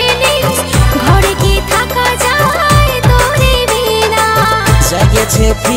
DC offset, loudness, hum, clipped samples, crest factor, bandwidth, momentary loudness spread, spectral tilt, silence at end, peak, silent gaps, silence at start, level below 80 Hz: 0.2%; -10 LUFS; none; under 0.1%; 10 dB; 16.5 kHz; 3 LU; -4 dB/octave; 0 s; 0 dBFS; none; 0 s; -16 dBFS